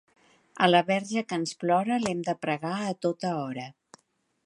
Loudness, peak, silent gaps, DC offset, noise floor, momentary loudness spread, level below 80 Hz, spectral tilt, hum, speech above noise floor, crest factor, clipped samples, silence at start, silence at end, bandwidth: -27 LUFS; -4 dBFS; none; under 0.1%; -72 dBFS; 10 LU; -74 dBFS; -5 dB/octave; none; 45 dB; 24 dB; under 0.1%; 0.55 s; 0.75 s; 11.5 kHz